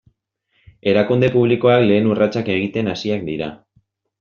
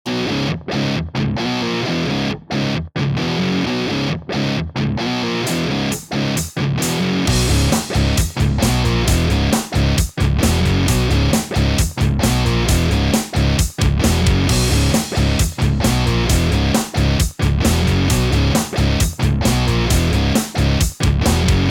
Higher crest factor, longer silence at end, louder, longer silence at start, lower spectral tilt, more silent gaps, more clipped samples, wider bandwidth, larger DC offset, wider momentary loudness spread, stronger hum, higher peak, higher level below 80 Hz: about the same, 16 dB vs 14 dB; first, 0.65 s vs 0 s; about the same, -17 LUFS vs -17 LUFS; first, 0.85 s vs 0.05 s; about the same, -5.5 dB/octave vs -5 dB/octave; neither; neither; second, 7 kHz vs 18 kHz; neither; first, 11 LU vs 5 LU; neither; about the same, -2 dBFS vs -2 dBFS; second, -54 dBFS vs -24 dBFS